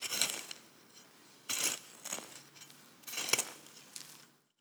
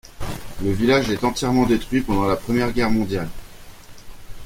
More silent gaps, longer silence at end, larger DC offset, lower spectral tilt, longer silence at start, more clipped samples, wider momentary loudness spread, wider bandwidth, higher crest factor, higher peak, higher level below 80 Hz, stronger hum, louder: neither; first, 0.35 s vs 0 s; neither; second, 1 dB/octave vs -5.5 dB/octave; about the same, 0 s vs 0.05 s; neither; first, 24 LU vs 13 LU; first, over 20 kHz vs 16.5 kHz; first, 32 dB vs 20 dB; second, -10 dBFS vs -2 dBFS; second, under -90 dBFS vs -36 dBFS; neither; second, -36 LUFS vs -21 LUFS